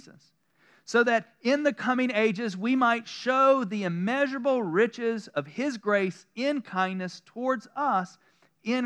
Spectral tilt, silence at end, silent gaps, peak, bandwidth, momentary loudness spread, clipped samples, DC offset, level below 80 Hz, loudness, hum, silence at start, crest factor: -5.5 dB/octave; 0 s; none; -10 dBFS; 10 kHz; 9 LU; under 0.1%; under 0.1%; under -90 dBFS; -27 LUFS; none; 0.05 s; 18 dB